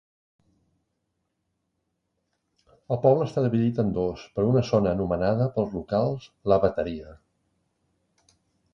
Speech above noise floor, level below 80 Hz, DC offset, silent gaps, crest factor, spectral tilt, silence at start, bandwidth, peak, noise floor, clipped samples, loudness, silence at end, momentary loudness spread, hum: 54 dB; -50 dBFS; under 0.1%; none; 20 dB; -8.5 dB/octave; 2.9 s; 7.2 kHz; -6 dBFS; -78 dBFS; under 0.1%; -25 LUFS; 1.6 s; 9 LU; none